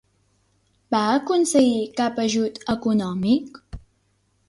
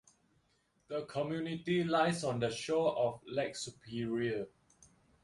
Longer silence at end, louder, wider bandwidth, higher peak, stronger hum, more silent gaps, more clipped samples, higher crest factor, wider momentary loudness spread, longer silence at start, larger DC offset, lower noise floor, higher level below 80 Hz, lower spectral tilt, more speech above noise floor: about the same, 0.7 s vs 0.75 s; first, -21 LUFS vs -35 LUFS; about the same, 11.5 kHz vs 11.5 kHz; first, -6 dBFS vs -16 dBFS; neither; neither; neither; about the same, 16 dB vs 20 dB; second, 7 LU vs 11 LU; about the same, 0.9 s vs 0.9 s; neither; second, -66 dBFS vs -75 dBFS; first, -50 dBFS vs -70 dBFS; about the same, -5 dB/octave vs -5.5 dB/octave; first, 46 dB vs 40 dB